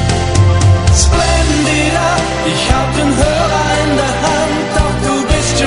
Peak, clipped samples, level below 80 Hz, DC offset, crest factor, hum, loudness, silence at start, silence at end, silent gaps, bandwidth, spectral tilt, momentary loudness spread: 0 dBFS; under 0.1%; -20 dBFS; 0.8%; 12 dB; none; -12 LUFS; 0 s; 0 s; none; 11 kHz; -4.5 dB/octave; 4 LU